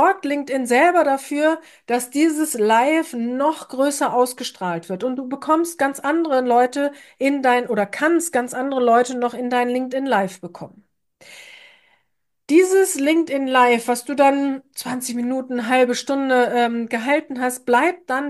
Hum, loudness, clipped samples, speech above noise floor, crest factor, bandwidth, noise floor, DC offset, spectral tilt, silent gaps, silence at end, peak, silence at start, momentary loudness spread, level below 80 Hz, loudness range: none; -19 LUFS; under 0.1%; 55 dB; 16 dB; 12.5 kHz; -74 dBFS; under 0.1%; -3.5 dB/octave; none; 0 s; -4 dBFS; 0 s; 9 LU; -72 dBFS; 4 LU